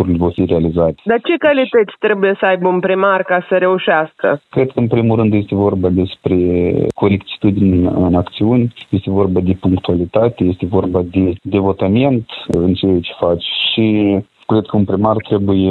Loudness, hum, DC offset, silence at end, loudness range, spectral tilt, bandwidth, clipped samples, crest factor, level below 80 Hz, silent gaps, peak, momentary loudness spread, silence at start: -14 LUFS; none; under 0.1%; 0 s; 2 LU; -9 dB/octave; 4.3 kHz; under 0.1%; 14 dB; -40 dBFS; none; 0 dBFS; 4 LU; 0 s